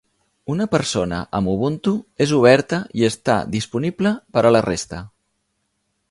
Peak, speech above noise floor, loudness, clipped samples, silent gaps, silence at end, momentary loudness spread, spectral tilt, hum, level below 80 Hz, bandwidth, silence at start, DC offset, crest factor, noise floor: 0 dBFS; 53 dB; -19 LUFS; under 0.1%; none; 1.05 s; 10 LU; -5.5 dB/octave; none; -48 dBFS; 11.5 kHz; 0.5 s; under 0.1%; 20 dB; -71 dBFS